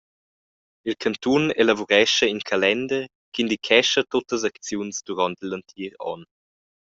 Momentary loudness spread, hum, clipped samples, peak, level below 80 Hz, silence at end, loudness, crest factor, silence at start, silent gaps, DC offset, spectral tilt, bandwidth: 15 LU; none; under 0.1%; -2 dBFS; -62 dBFS; 0.6 s; -22 LUFS; 20 dB; 0.85 s; 3.15-3.32 s; under 0.1%; -3 dB/octave; 8 kHz